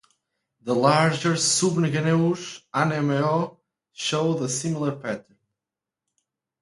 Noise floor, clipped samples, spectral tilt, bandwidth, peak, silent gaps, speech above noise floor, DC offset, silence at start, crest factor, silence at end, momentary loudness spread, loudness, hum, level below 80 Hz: -88 dBFS; under 0.1%; -4.5 dB/octave; 11.5 kHz; -4 dBFS; none; 66 dB; under 0.1%; 0.65 s; 22 dB; 1.4 s; 12 LU; -23 LUFS; none; -66 dBFS